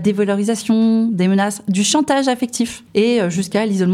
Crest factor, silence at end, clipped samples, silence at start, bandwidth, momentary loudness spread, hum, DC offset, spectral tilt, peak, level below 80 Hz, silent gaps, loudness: 16 dB; 0 s; under 0.1%; 0 s; 14.5 kHz; 4 LU; none; under 0.1%; -5 dB/octave; -2 dBFS; -58 dBFS; none; -17 LUFS